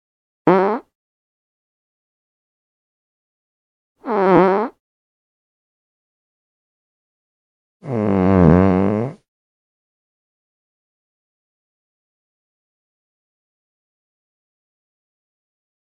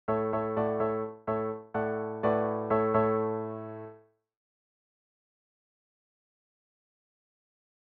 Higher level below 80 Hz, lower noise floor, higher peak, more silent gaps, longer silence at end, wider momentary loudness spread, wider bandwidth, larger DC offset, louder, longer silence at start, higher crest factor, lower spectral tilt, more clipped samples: first, -46 dBFS vs -66 dBFS; first, under -90 dBFS vs -55 dBFS; first, 0 dBFS vs -14 dBFS; first, 0.95-3.95 s, 4.80-7.80 s vs none; first, 6.75 s vs 3.9 s; first, 15 LU vs 12 LU; first, 6 kHz vs 4.4 kHz; neither; first, -16 LUFS vs -30 LUFS; first, 0.45 s vs 0.1 s; about the same, 22 dB vs 20 dB; first, -10 dB/octave vs -7.5 dB/octave; neither